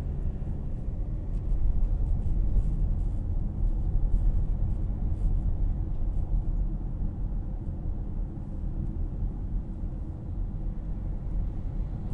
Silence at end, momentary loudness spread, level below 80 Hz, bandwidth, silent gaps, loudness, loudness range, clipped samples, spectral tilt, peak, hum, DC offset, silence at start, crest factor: 0 s; 6 LU; -28 dBFS; 2 kHz; none; -33 LUFS; 5 LU; under 0.1%; -11 dB/octave; -14 dBFS; none; under 0.1%; 0 s; 14 dB